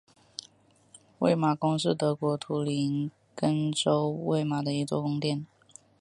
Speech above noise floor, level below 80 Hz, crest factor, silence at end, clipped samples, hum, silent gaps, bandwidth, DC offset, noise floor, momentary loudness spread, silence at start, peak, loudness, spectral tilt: 33 dB; -72 dBFS; 20 dB; 0.55 s; under 0.1%; none; none; 11.5 kHz; under 0.1%; -61 dBFS; 12 LU; 1.2 s; -10 dBFS; -28 LUFS; -6 dB/octave